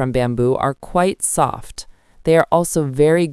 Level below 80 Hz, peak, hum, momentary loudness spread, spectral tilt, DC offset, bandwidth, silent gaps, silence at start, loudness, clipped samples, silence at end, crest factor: -40 dBFS; 0 dBFS; none; 12 LU; -5.5 dB/octave; under 0.1%; 12 kHz; none; 0 s; -17 LUFS; under 0.1%; 0 s; 18 dB